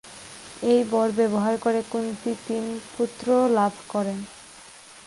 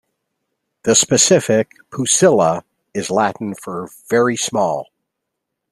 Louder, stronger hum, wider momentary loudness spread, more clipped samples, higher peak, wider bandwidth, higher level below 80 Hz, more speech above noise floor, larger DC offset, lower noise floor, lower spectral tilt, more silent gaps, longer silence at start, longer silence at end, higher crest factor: second, -24 LUFS vs -16 LUFS; neither; first, 20 LU vs 15 LU; neither; second, -10 dBFS vs 0 dBFS; second, 11.5 kHz vs 14 kHz; about the same, -64 dBFS vs -60 dBFS; second, 23 dB vs 62 dB; neither; second, -47 dBFS vs -78 dBFS; first, -5.5 dB/octave vs -3 dB/octave; neither; second, 0.05 s vs 0.85 s; second, 0.05 s vs 0.9 s; about the same, 16 dB vs 18 dB